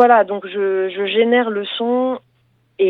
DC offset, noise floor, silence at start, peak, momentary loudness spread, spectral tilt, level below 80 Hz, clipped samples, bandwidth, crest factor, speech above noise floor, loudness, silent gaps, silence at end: under 0.1%; -60 dBFS; 0 s; 0 dBFS; 7 LU; -7 dB/octave; -72 dBFS; under 0.1%; 4.2 kHz; 16 dB; 44 dB; -17 LUFS; none; 0 s